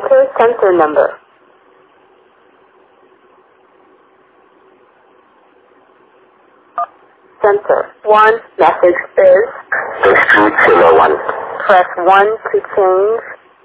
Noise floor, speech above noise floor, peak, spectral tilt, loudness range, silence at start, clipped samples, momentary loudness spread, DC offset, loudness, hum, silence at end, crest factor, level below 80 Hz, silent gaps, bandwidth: -49 dBFS; 38 dB; 0 dBFS; -8 dB/octave; 14 LU; 0 s; 0.2%; 12 LU; under 0.1%; -11 LUFS; none; 0.3 s; 14 dB; -54 dBFS; none; 4 kHz